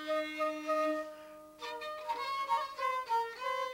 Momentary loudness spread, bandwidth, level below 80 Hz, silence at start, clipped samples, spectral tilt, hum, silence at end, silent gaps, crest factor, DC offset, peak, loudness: 12 LU; 17 kHz; -76 dBFS; 0 s; under 0.1%; -2.5 dB/octave; 50 Hz at -75 dBFS; 0 s; none; 14 dB; under 0.1%; -22 dBFS; -36 LUFS